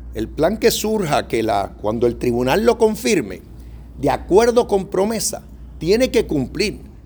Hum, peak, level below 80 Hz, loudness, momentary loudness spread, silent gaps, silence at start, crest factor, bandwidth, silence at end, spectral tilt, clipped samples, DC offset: none; 0 dBFS; -36 dBFS; -18 LUFS; 8 LU; none; 0 s; 18 dB; over 20 kHz; 0.05 s; -4.5 dB/octave; under 0.1%; under 0.1%